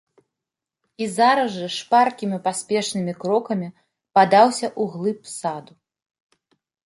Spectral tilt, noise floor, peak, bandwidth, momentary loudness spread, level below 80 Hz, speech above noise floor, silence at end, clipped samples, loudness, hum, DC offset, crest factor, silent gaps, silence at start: -4.5 dB/octave; -86 dBFS; -2 dBFS; 11.5 kHz; 13 LU; -72 dBFS; 66 dB; 1.25 s; under 0.1%; -21 LUFS; none; under 0.1%; 20 dB; none; 1 s